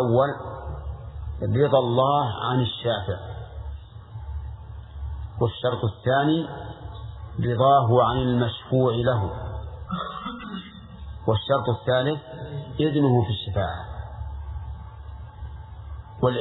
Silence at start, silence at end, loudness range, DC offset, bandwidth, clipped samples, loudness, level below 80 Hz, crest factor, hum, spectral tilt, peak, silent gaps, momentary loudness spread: 0 s; 0 s; 7 LU; under 0.1%; 4.1 kHz; under 0.1%; -24 LUFS; -40 dBFS; 20 dB; none; -10.5 dB/octave; -6 dBFS; none; 19 LU